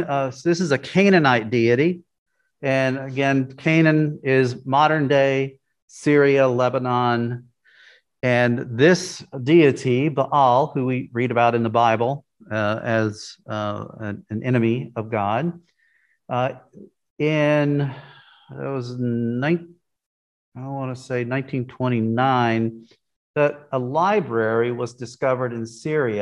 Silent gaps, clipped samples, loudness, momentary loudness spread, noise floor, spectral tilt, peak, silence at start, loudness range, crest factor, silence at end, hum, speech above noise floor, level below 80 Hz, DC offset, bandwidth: 2.18-2.26 s, 5.82-5.88 s, 17.10-17.16 s, 20.06-20.52 s, 23.16-23.34 s; under 0.1%; -21 LUFS; 13 LU; -64 dBFS; -6.5 dB/octave; -2 dBFS; 0 s; 7 LU; 20 dB; 0 s; none; 43 dB; -66 dBFS; under 0.1%; 11.5 kHz